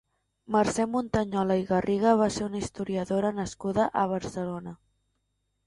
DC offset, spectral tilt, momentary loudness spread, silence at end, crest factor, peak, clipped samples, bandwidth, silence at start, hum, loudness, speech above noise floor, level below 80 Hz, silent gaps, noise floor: under 0.1%; -6 dB/octave; 10 LU; 0.9 s; 18 dB; -10 dBFS; under 0.1%; 11.5 kHz; 0.5 s; 50 Hz at -60 dBFS; -27 LUFS; 50 dB; -54 dBFS; none; -77 dBFS